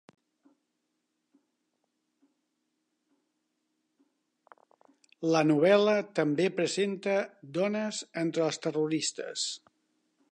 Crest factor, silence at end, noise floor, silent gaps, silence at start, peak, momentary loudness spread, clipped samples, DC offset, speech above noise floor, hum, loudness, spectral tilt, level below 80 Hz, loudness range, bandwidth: 22 dB; 0.75 s; -81 dBFS; none; 5.2 s; -10 dBFS; 11 LU; under 0.1%; under 0.1%; 53 dB; none; -29 LUFS; -4.5 dB/octave; -86 dBFS; 5 LU; 10.5 kHz